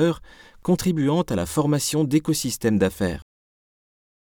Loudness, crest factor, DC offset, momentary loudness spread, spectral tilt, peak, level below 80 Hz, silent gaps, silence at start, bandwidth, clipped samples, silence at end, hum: -23 LUFS; 16 dB; under 0.1%; 7 LU; -5.5 dB/octave; -8 dBFS; -48 dBFS; none; 0 s; over 20 kHz; under 0.1%; 1 s; none